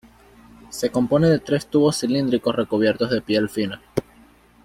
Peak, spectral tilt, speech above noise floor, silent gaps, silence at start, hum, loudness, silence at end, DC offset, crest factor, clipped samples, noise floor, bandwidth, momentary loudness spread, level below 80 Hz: -4 dBFS; -6 dB/octave; 32 dB; none; 0.7 s; none; -21 LUFS; 0.65 s; under 0.1%; 18 dB; under 0.1%; -52 dBFS; 16 kHz; 10 LU; -52 dBFS